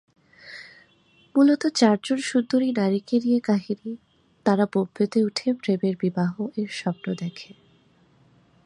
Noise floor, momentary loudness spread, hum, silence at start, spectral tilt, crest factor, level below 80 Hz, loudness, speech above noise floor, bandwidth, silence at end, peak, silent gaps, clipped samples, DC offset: -59 dBFS; 16 LU; none; 0.45 s; -6 dB/octave; 18 dB; -72 dBFS; -24 LUFS; 37 dB; 11 kHz; 1.2 s; -6 dBFS; none; under 0.1%; under 0.1%